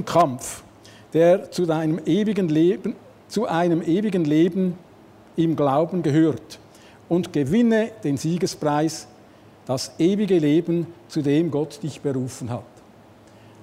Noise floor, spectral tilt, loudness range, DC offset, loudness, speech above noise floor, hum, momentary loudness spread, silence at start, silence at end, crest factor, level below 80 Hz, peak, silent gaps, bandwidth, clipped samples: -49 dBFS; -6.5 dB/octave; 2 LU; under 0.1%; -22 LUFS; 28 dB; none; 13 LU; 0 s; 1 s; 16 dB; -60 dBFS; -6 dBFS; none; 15.5 kHz; under 0.1%